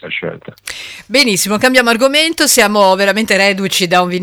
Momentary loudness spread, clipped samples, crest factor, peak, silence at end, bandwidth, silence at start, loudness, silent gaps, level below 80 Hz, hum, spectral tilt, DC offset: 16 LU; under 0.1%; 12 dB; 0 dBFS; 0 s; over 20 kHz; 0.05 s; -11 LUFS; none; -50 dBFS; none; -2.5 dB/octave; under 0.1%